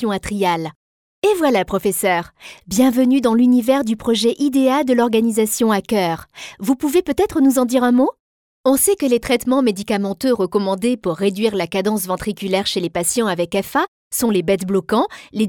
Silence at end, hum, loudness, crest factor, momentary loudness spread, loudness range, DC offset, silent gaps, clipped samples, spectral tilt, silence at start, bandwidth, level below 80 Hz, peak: 0 s; none; -18 LUFS; 14 dB; 7 LU; 3 LU; under 0.1%; 0.76-1.22 s, 8.20-8.64 s, 13.88-14.11 s; under 0.1%; -4.5 dB/octave; 0 s; 19 kHz; -48 dBFS; -2 dBFS